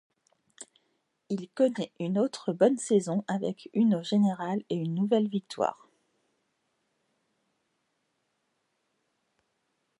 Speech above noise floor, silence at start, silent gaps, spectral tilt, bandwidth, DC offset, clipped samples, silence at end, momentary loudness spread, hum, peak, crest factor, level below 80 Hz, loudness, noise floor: 50 dB; 0.6 s; none; -6.5 dB/octave; 11 kHz; under 0.1%; under 0.1%; 4.25 s; 11 LU; none; -12 dBFS; 20 dB; -80 dBFS; -28 LUFS; -78 dBFS